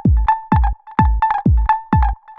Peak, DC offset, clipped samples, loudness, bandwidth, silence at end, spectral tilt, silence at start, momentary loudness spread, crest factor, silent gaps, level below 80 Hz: 0 dBFS; under 0.1%; under 0.1%; -17 LUFS; 4.3 kHz; 0.05 s; -10 dB/octave; 0.05 s; 2 LU; 14 dB; none; -18 dBFS